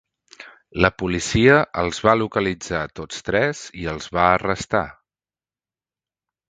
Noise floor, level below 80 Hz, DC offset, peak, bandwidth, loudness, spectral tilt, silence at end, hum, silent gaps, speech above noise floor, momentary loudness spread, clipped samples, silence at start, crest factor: under -90 dBFS; -42 dBFS; under 0.1%; 0 dBFS; 9.4 kHz; -20 LUFS; -5 dB/octave; 1.6 s; none; none; over 70 dB; 14 LU; under 0.1%; 0.4 s; 22 dB